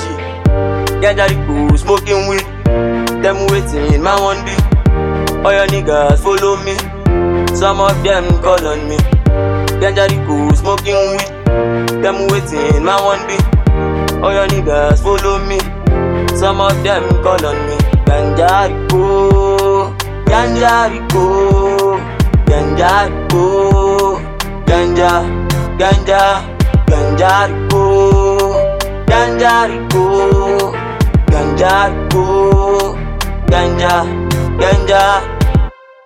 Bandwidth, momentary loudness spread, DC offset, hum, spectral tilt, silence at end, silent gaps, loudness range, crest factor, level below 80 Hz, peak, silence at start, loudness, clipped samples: 16.5 kHz; 5 LU; under 0.1%; none; -6 dB/octave; 0.3 s; none; 2 LU; 12 dB; -18 dBFS; 0 dBFS; 0 s; -12 LUFS; under 0.1%